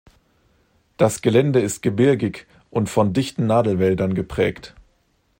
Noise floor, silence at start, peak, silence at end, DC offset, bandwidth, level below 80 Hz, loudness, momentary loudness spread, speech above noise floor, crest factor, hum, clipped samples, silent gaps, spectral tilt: -64 dBFS; 1 s; -4 dBFS; 0.7 s; under 0.1%; 16.5 kHz; -50 dBFS; -20 LUFS; 8 LU; 45 dB; 18 dB; none; under 0.1%; none; -6.5 dB/octave